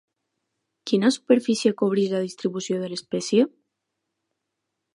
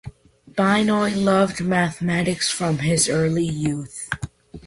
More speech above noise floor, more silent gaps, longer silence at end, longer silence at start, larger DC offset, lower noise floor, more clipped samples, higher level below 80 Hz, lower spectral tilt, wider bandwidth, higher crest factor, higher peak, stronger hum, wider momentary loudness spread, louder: first, 59 dB vs 21 dB; neither; first, 1.45 s vs 0.05 s; first, 0.85 s vs 0.05 s; neither; first, -81 dBFS vs -41 dBFS; neither; second, -76 dBFS vs -48 dBFS; about the same, -5 dB/octave vs -4.5 dB/octave; about the same, 11 kHz vs 11.5 kHz; about the same, 20 dB vs 16 dB; about the same, -6 dBFS vs -6 dBFS; neither; about the same, 9 LU vs 11 LU; about the same, -23 LUFS vs -21 LUFS